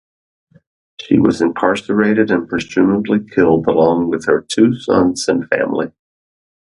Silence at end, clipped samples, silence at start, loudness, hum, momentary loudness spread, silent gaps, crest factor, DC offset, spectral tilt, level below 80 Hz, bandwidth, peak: 0.75 s; under 0.1%; 1 s; -15 LUFS; none; 5 LU; none; 16 dB; under 0.1%; -6 dB/octave; -48 dBFS; 11.5 kHz; 0 dBFS